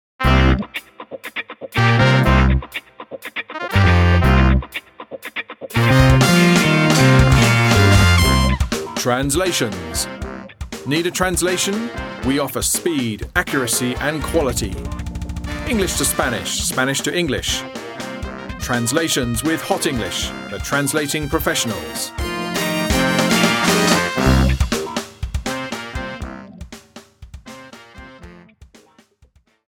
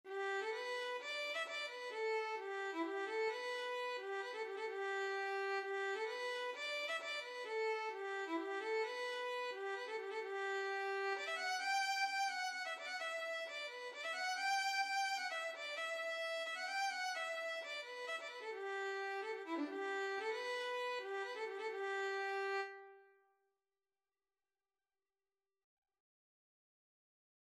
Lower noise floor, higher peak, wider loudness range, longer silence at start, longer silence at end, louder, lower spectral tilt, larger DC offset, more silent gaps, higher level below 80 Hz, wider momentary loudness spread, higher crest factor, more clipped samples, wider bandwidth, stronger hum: second, -55 dBFS vs under -90 dBFS; first, 0 dBFS vs -28 dBFS; first, 7 LU vs 3 LU; first, 0.2 s vs 0.05 s; second, 1.3 s vs 4.4 s; first, -17 LUFS vs -41 LUFS; first, -4.5 dB/octave vs 1 dB/octave; neither; neither; first, -26 dBFS vs under -90 dBFS; first, 17 LU vs 6 LU; about the same, 18 dB vs 16 dB; neither; first, 18.5 kHz vs 15 kHz; neither